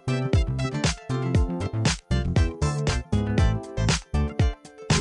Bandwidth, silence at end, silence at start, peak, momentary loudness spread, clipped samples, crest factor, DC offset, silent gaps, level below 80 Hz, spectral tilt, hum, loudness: 11.5 kHz; 0 s; 0.05 s; -8 dBFS; 4 LU; under 0.1%; 16 dB; under 0.1%; none; -30 dBFS; -5.5 dB/octave; none; -25 LUFS